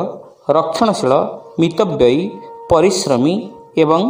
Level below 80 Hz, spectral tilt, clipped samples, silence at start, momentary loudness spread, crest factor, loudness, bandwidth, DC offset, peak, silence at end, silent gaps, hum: -46 dBFS; -5.5 dB/octave; under 0.1%; 0 s; 11 LU; 16 dB; -15 LUFS; 16 kHz; under 0.1%; 0 dBFS; 0 s; none; none